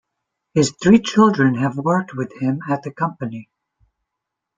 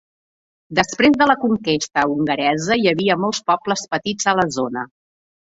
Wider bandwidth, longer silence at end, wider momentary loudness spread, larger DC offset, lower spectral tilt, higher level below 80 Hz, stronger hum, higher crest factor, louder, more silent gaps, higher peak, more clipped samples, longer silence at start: first, 9.4 kHz vs 8 kHz; first, 1.15 s vs 0.55 s; first, 14 LU vs 8 LU; neither; first, -6 dB/octave vs -4 dB/octave; about the same, -56 dBFS vs -54 dBFS; neither; about the same, 18 dB vs 18 dB; about the same, -18 LUFS vs -18 LUFS; neither; about the same, -2 dBFS vs -2 dBFS; neither; second, 0.55 s vs 0.7 s